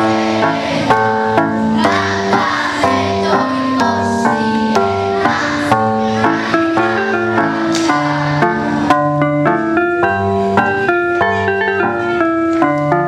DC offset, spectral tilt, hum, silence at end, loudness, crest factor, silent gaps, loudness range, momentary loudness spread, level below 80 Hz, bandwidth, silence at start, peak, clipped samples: under 0.1%; -5.5 dB/octave; none; 0 s; -14 LUFS; 14 dB; none; 0 LU; 2 LU; -48 dBFS; 12.5 kHz; 0 s; 0 dBFS; under 0.1%